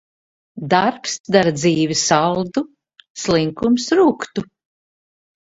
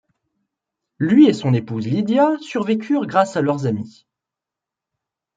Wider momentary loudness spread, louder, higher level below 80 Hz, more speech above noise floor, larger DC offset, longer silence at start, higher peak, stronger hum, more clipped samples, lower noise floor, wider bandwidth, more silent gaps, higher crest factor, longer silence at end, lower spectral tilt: about the same, 12 LU vs 11 LU; about the same, -18 LUFS vs -18 LUFS; first, -54 dBFS vs -64 dBFS; first, over 73 dB vs 69 dB; neither; second, 0.55 s vs 1 s; about the same, 0 dBFS vs -2 dBFS; neither; neither; first, under -90 dBFS vs -86 dBFS; about the same, 8 kHz vs 7.8 kHz; first, 1.20-1.24 s, 3.10-3.15 s vs none; about the same, 18 dB vs 18 dB; second, 1.05 s vs 1.45 s; second, -4.5 dB/octave vs -7.5 dB/octave